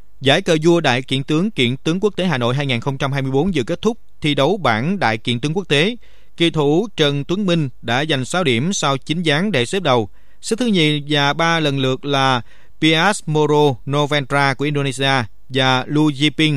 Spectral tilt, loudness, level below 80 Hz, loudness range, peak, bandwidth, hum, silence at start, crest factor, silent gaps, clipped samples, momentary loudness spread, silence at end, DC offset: -5 dB/octave; -17 LUFS; -48 dBFS; 2 LU; 0 dBFS; 13.5 kHz; none; 0.2 s; 18 dB; none; under 0.1%; 5 LU; 0 s; 3%